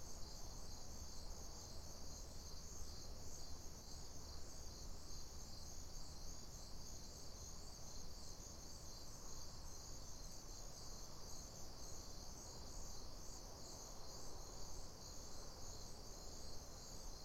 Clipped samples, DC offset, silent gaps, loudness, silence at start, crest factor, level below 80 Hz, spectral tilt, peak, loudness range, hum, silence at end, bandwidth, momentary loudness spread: under 0.1%; under 0.1%; none; -55 LUFS; 0 s; 14 dB; -56 dBFS; -3 dB/octave; -36 dBFS; 0 LU; none; 0 s; 16 kHz; 1 LU